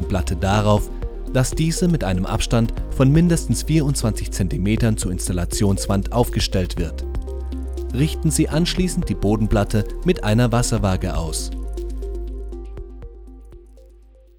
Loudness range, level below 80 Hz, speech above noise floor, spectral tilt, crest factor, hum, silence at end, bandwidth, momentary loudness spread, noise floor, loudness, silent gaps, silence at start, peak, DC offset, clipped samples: 4 LU; -26 dBFS; 28 dB; -5.5 dB/octave; 18 dB; none; 0.5 s; 17.5 kHz; 12 LU; -47 dBFS; -21 LUFS; none; 0 s; -2 dBFS; under 0.1%; under 0.1%